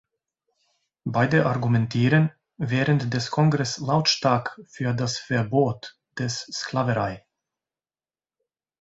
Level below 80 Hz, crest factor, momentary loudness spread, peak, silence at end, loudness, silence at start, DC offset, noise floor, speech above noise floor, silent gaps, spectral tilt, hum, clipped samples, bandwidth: -58 dBFS; 20 dB; 11 LU; -6 dBFS; 1.65 s; -24 LUFS; 1.05 s; under 0.1%; under -90 dBFS; over 67 dB; none; -5.5 dB/octave; none; under 0.1%; 8 kHz